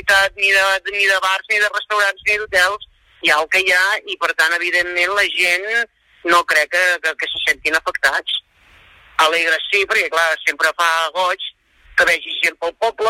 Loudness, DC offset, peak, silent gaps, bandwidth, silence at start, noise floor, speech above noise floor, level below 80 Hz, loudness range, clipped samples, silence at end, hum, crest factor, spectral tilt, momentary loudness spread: -16 LUFS; under 0.1%; -2 dBFS; none; 16.5 kHz; 0.05 s; -49 dBFS; 32 dB; -54 dBFS; 2 LU; under 0.1%; 0 s; none; 16 dB; 0 dB/octave; 6 LU